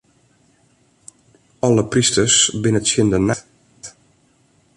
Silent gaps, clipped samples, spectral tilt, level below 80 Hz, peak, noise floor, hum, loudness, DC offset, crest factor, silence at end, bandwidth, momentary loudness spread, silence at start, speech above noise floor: none; under 0.1%; -3.5 dB/octave; -46 dBFS; -2 dBFS; -58 dBFS; none; -16 LUFS; under 0.1%; 18 dB; 0.9 s; 11.5 kHz; 25 LU; 1.65 s; 42 dB